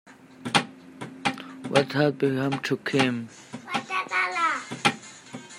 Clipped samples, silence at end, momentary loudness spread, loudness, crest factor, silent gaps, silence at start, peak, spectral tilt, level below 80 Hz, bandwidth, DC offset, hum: under 0.1%; 0 s; 17 LU; -26 LUFS; 22 dB; none; 0.05 s; -6 dBFS; -4.5 dB/octave; -70 dBFS; 15.5 kHz; under 0.1%; none